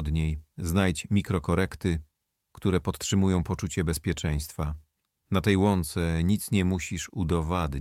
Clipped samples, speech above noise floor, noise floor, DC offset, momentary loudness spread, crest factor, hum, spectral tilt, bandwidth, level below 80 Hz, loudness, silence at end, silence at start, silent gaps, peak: under 0.1%; 31 dB; -57 dBFS; under 0.1%; 8 LU; 16 dB; none; -6 dB/octave; 16 kHz; -40 dBFS; -28 LUFS; 0 s; 0 s; none; -10 dBFS